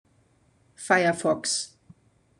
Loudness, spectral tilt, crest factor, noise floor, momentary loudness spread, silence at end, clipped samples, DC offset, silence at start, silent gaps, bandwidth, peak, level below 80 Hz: -24 LUFS; -3 dB/octave; 22 dB; -64 dBFS; 16 LU; 0.7 s; under 0.1%; under 0.1%; 0.8 s; none; 12.5 kHz; -6 dBFS; -70 dBFS